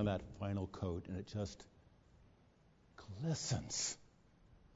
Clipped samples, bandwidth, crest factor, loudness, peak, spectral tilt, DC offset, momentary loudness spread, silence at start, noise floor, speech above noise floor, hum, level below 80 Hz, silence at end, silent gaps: under 0.1%; 7.6 kHz; 20 dB; -42 LUFS; -24 dBFS; -6 dB/octave; under 0.1%; 16 LU; 0 s; -69 dBFS; 28 dB; none; -64 dBFS; 0.1 s; none